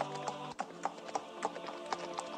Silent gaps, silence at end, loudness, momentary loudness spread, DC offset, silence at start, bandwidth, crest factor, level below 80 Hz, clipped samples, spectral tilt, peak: none; 0 s; -41 LUFS; 3 LU; under 0.1%; 0 s; 14 kHz; 22 dB; -80 dBFS; under 0.1%; -3.5 dB/octave; -18 dBFS